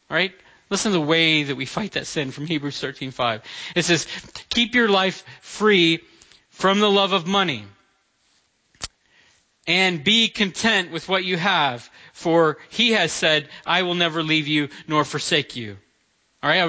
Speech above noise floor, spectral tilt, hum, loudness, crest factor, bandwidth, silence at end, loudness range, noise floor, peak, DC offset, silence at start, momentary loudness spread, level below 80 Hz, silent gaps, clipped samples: 44 dB; -3.5 dB/octave; none; -20 LUFS; 18 dB; 8 kHz; 0 s; 3 LU; -65 dBFS; -4 dBFS; under 0.1%; 0.1 s; 13 LU; -58 dBFS; none; under 0.1%